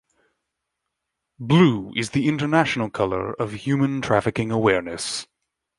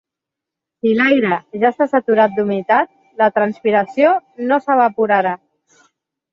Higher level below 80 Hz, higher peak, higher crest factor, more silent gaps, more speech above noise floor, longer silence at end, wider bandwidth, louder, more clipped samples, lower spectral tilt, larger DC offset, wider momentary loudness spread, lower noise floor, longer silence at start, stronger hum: first, -54 dBFS vs -64 dBFS; about the same, -2 dBFS vs -2 dBFS; first, 22 dB vs 16 dB; neither; second, 60 dB vs 69 dB; second, 0.55 s vs 0.95 s; first, 11.5 kHz vs 7.2 kHz; second, -22 LUFS vs -16 LUFS; neither; second, -6 dB/octave vs -7.5 dB/octave; neither; first, 11 LU vs 6 LU; about the same, -81 dBFS vs -84 dBFS; first, 1.4 s vs 0.85 s; neither